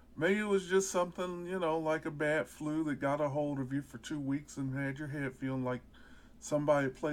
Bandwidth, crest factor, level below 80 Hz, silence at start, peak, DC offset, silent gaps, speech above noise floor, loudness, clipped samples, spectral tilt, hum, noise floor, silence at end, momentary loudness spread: 17 kHz; 18 dB; -62 dBFS; 0.1 s; -18 dBFS; under 0.1%; none; 22 dB; -35 LUFS; under 0.1%; -5.5 dB/octave; none; -56 dBFS; 0 s; 9 LU